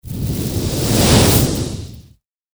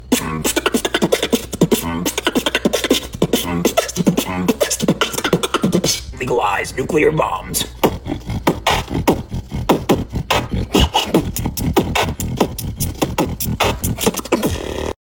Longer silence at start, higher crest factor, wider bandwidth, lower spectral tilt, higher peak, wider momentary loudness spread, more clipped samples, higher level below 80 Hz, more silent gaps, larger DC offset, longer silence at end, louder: about the same, 0.05 s vs 0 s; about the same, 16 dB vs 18 dB; first, over 20 kHz vs 17.5 kHz; about the same, -4.5 dB/octave vs -4 dB/octave; about the same, 0 dBFS vs 0 dBFS; first, 16 LU vs 5 LU; neither; about the same, -28 dBFS vs -32 dBFS; neither; neither; first, 0.55 s vs 0.1 s; first, -15 LUFS vs -18 LUFS